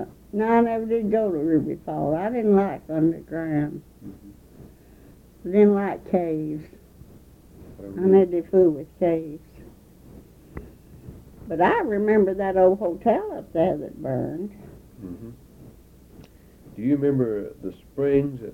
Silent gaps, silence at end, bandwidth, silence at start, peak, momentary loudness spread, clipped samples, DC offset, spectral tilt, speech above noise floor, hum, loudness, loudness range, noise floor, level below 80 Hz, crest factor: none; 0 s; 16.5 kHz; 0 s; -6 dBFS; 22 LU; under 0.1%; under 0.1%; -9.5 dB/octave; 27 dB; none; -23 LUFS; 7 LU; -50 dBFS; -52 dBFS; 18 dB